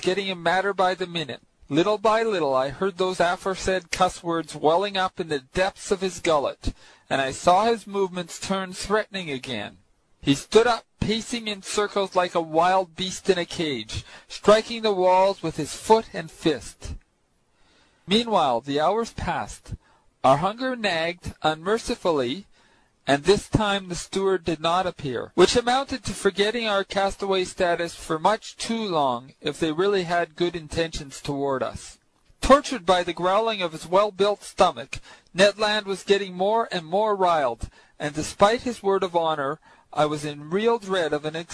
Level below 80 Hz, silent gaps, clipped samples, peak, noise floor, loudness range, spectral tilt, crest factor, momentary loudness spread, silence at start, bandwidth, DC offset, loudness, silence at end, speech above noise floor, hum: -46 dBFS; none; under 0.1%; -4 dBFS; -67 dBFS; 3 LU; -4.5 dB/octave; 20 dB; 11 LU; 0 s; 11 kHz; under 0.1%; -24 LUFS; 0 s; 44 dB; none